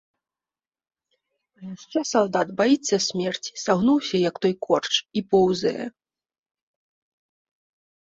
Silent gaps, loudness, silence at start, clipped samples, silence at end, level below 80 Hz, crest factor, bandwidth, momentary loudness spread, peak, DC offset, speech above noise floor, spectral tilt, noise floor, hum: none; -23 LUFS; 1.6 s; under 0.1%; 2.15 s; -64 dBFS; 20 dB; 8 kHz; 11 LU; -6 dBFS; under 0.1%; over 67 dB; -4.5 dB/octave; under -90 dBFS; none